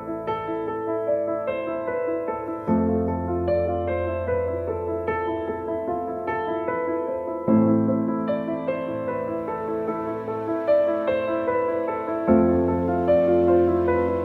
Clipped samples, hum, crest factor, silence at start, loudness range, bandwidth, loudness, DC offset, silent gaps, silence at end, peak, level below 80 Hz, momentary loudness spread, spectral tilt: under 0.1%; none; 16 dB; 0 s; 5 LU; 4.5 kHz; -24 LUFS; under 0.1%; none; 0 s; -8 dBFS; -48 dBFS; 9 LU; -10 dB/octave